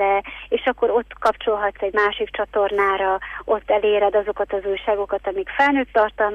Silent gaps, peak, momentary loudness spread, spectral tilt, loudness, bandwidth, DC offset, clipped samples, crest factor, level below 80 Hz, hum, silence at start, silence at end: none; -6 dBFS; 6 LU; -5 dB/octave; -21 LUFS; 8.4 kHz; under 0.1%; under 0.1%; 14 dB; -48 dBFS; 50 Hz at -50 dBFS; 0 s; 0 s